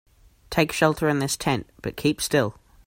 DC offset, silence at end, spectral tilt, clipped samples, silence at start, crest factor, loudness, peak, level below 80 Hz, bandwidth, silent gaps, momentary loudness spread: under 0.1%; 0.35 s; -4.5 dB/octave; under 0.1%; 0.5 s; 20 dB; -24 LUFS; -4 dBFS; -50 dBFS; 16.5 kHz; none; 7 LU